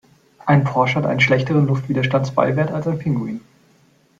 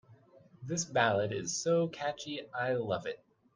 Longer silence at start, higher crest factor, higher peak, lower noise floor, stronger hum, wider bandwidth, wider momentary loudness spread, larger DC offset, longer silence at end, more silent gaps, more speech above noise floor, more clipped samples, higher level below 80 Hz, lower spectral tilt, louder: first, 0.45 s vs 0.1 s; second, 16 dB vs 22 dB; first, -2 dBFS vs -12 dBFS; second, -56 dBFS vs -60 dBFS; neither; second, 7.6 kHz vs 10 kHz; second, 8 LU vs 12 LU; neither; first, 0.8 s vs 0.4 s; neither; first, 38 dB vs 27 dB; neither; first, -54 dBFS vs -72 dBFS; first, -7.5 dB/octave vs -4 dB/octave; first, -18 LUFS vs -33 LUFS